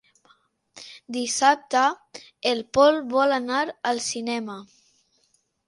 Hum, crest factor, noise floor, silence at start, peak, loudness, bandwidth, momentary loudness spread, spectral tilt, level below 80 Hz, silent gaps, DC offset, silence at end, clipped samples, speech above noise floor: none; 20 dB; -68 dBFS; 0.75 s; -4 dBFS; -23 LUFS; 11.5 kHz; 22 LU; -2 dB/octave; -66 dBFS; none; under 0.1%; 1.05 s; under 0.1%; 45 dB